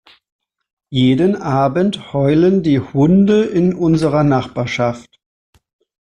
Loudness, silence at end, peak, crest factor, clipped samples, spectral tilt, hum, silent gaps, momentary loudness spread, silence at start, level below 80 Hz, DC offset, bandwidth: -15 LUFS; 1.1 s; -2 dBFS; 12 dB; under 0.1%; -8 dB/octave; none; none; 7 LU; 0.9 s; -46 dBFS; under 0.1%; 10 kHz